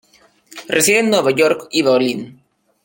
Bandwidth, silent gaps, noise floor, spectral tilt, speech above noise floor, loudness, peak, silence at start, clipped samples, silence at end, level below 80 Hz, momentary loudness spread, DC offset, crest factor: 17 kHz; none; -49 dBFS; -3 dB/octave; 33 dB; -15 LUFS; 0 dBFS; 0.55 s; under 0.1%; 0.55 s; -60 dBFS; 16 LU; under 0.1%; 18 dB